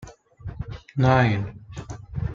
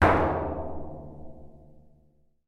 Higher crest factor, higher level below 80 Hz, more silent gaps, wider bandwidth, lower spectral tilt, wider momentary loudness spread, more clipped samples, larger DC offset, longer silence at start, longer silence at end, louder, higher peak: about the same, 20 dB vs 24 dB; about the same, -42 dBFS vs -42 dBFS; neither; second, 7.4 kHz vs 11.5 kHz; about the same, -7.5 dB/octave vs -8 dB/octave; second, 21 LU vs 25 LU; neither; neither; about the same, 0 s vs 0 s; second, 0 s vs 0.7 s; first, -22 LUFS vs -28 LUFS; about the same, -4 dBFS vs -6 dBFS